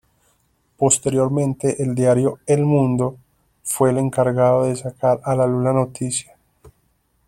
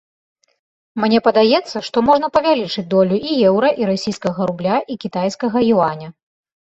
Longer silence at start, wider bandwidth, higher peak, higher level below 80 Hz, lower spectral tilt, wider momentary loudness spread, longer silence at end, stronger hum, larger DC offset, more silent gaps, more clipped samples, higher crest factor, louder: second, 0.8 s vs 0.95 s; first, 15.5 kHz vs 8 kHz; about the same, -2 dBFS vs -2 dBFS; about the same, -52 dBFS vs -56 dBFS; about the same, -6 dB/octave vs -6 dB/octave; about the same, 7 LU vs 8 LU; first, 1.05 s vs 0.55 s; neither; neither; neither; neither; about the same, 18 dB vs 16 dB; about the same, -19 LUFS vs -17 LUFS